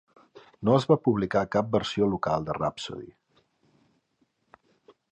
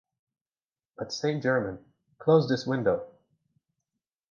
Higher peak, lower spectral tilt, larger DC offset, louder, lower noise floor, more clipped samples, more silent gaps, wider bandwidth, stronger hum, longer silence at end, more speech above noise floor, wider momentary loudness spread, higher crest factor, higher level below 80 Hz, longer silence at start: about the same, -8 dBFS vs -8 dBFS; about the same, -7 dB/octave vs -6.5 dB/octave; neither; about the same, -26 LUFS vs -27 LUFS; second, -72 dBFS vs under -90 dBFS; neither; neither; first, 9.8 kHz vs 7.2 kHz; neither; first, 2 s vs 1.25 s; second, 47 dB vs over 64 dB; second, 11 LU vs 17 LU; about the same, 20 dB vs 22 dB; first, -56 dBFS vs -64 dBFS; second, 0.35 s vs 1 s